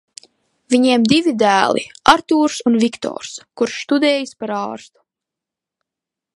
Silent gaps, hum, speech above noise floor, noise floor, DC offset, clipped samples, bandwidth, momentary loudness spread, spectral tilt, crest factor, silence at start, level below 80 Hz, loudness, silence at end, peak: none; none; 69 dB; -85 dBFS; under 0.1%; under 0.1%; 11.5 kHz; 13 LU; -4 dB/octave; 18 dB; 0.7 s; -56 dBFS; -16 LUFS; 1.55 s; 0 dBFS